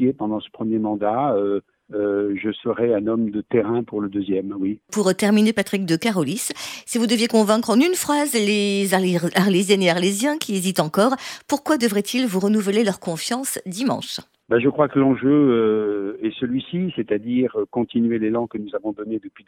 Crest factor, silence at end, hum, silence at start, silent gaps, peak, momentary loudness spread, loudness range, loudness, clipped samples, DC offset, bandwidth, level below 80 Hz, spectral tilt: 18 dB; 0.2 s; none; 0 s; none; -4 dBFS; 9 LU; 4 LU; -21 LUFS; under 0.1%; under 0.1%; 18 kHz; -62 dBFS; -5 dB/octave